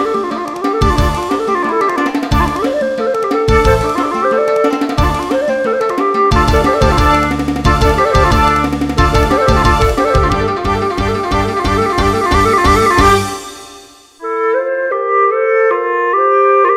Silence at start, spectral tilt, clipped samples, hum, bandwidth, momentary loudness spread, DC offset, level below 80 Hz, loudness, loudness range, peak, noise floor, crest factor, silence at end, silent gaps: 0 s; -5.5 dB/octave; under 0.1%; none; 16.5 kHz; 6 LU; under 0.1%; -22 dBFS; -13 LUFS; 2 LU; 0 dBFS; -38 dBFS; 12 dB; 0 s; none